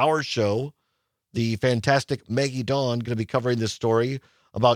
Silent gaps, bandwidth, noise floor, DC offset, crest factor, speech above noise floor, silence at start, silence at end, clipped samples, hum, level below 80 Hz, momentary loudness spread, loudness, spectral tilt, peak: none; 14.5 kHz; -77 dBFS; under 0.1%; 20 dB; 53 dB; 0 s; 0 s; under 0.1%; none; -60 dBFS; 7 LU; -24 LUFS; -5.5 dB/octave; -4 dBFS